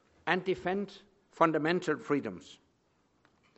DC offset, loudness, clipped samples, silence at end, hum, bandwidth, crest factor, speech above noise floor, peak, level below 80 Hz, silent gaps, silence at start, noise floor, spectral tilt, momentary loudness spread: under 0.1%; -31 LUFS; under 0.1%; 1.05 s; none; 8.2 kHz; 24 dB; 41 dB; -10 dBFS; -70 dBFS; none; 0.25 s; -72 dBFS; -6 dB/octave; 14 LU